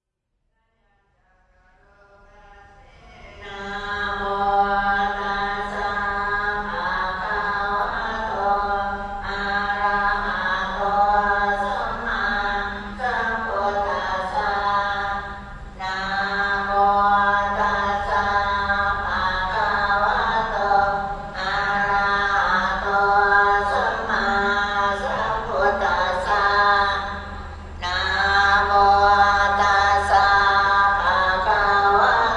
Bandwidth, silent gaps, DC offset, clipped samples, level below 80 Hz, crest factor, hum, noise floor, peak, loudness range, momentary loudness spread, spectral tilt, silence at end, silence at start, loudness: 10.5 kHz; none; under 0.1%; under 0.1%; -40 dBFS; 16 dB; none; -74 dBFS; -4 dBFS; 7 LU; 10 LU; -4 dB/octave; 0 s; 2.5 s; -20 LUFS